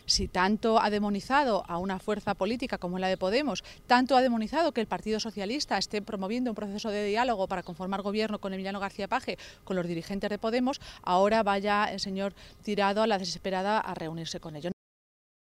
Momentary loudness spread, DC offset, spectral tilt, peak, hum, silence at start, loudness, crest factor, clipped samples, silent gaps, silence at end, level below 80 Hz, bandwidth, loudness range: 11 LU; under 0.1%; -4.5 dB/octave; -10 dBFS; none; 0.05 s; -29 LUFS; 20 dB; under 0.1%; none; 0.9 s; -52 dBFS; 15 kHz; 4 LU